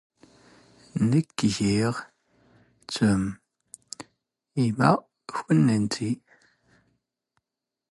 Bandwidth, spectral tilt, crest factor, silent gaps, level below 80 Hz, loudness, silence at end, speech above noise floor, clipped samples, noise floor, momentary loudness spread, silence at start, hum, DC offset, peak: 11.5 kHz; -6 dB/octave; 20 dB; none; -56 dBFS; -25 LUFS; 1.75 s; 64 dB; under 0.1%; -87 dBFS; 17 LU; 0.95 s; none; under 0.1%; -6 dBFS